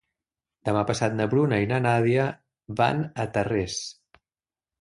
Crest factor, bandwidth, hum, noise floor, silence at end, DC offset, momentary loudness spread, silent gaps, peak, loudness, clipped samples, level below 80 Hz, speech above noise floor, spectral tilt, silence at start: 18 dB; 11.5 kHz; none; under -90 dBFS; 0.9 s; under 0.1%; 11 LU; none; -8 dBFS; -25 LUFS; under 0.1%; -54 dBFS; over 66 dB; -6 dB/octave; 0.65 s